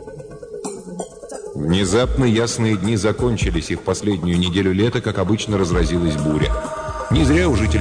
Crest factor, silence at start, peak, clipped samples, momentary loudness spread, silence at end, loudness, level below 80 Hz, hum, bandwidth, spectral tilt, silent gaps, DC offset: 12 dB; 0 s; -8 dBFS; under 0.1%; 14 LU; 0 s; -19 LUFS; -28 dBFS; none; 10 kHz; -5.5 dB/octave; none; under 0.1%